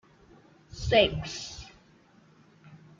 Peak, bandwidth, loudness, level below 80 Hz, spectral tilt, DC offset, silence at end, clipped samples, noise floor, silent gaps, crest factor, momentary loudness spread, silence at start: -8 dBFS; 7.6 kHz; -27 LUFS; -48 dBFS; -4.5 dB/octave; under 0.1%; 0.2 s; under 0.1%; -59 dBFS; none; 24 dB; 25 LU; 0.7 s